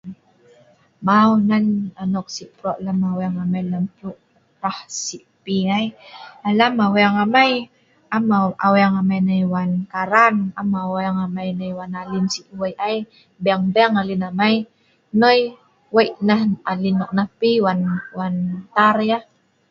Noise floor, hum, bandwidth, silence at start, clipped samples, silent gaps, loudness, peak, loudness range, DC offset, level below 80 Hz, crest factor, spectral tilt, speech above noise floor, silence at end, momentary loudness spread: -53 dBFS; none; 7.8 kHz; 0.05 s; under 0.1%; none; -19 LUFS; 0 dBFS; 7 LU; under 0.1%; -60 dBFS; 20 dB; -6 dB/octave; 35 dB; 0.5 s; 13 LU